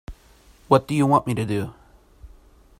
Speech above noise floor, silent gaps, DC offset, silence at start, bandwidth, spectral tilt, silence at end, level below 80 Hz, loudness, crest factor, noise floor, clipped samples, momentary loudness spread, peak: 33 dB; none; under 0.1%; 0.1 s; 16 kHz; -7 dB/octave; 0.55 s; -48 dBFS; -21 LUFS; 22 dB; -53 dBFS; under 0.1%; 9 LU; -2 dBFS